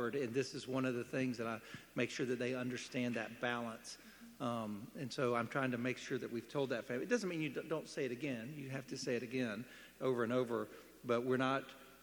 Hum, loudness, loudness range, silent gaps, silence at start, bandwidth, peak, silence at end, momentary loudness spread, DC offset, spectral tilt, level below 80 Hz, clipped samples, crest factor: none; -40 LUFS; 2 LU; none; 0 s; 19.5 kHz; -22 dBFS; 0 s; 10 LU; under 0.1%; -5.5 dB/octave; -78 dBFS; under 0.1%; 18 dB